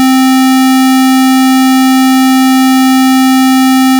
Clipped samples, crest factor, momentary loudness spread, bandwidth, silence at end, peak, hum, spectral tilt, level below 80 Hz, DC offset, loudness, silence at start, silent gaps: under 0.1%; 0 dB; 0 LU; over 20 kHz; 0 s; -6 dBFS; none; -1.5 dB/octave; -56 dBFS; under 0.1%; -6 LUFS; 0 s; none